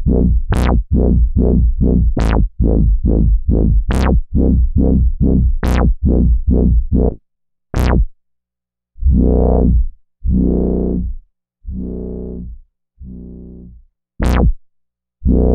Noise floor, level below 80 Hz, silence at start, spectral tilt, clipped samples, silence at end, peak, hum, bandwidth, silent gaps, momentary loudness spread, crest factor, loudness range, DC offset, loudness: -84 dBFS; -16 dBFS; 0 s; -9 dB/octave; under 0.1%; 0 s; 0 dBFS; none; 7 kHz; none; 13 LU; 14 dB; 9 LU; under 0.1%; -16 LUFS